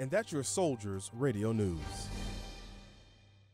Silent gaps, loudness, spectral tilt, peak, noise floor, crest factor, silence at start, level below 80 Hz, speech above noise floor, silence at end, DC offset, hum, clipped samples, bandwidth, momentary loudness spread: none; -36 LUFS; -5 dB/octave; -18 dBFS; -61 dBFS; 18 dB; 0 s; -50 dBFS; 27 dB; 0.45 s; under 0.1%; none; under 0.1%; 16 kHz; 17 LU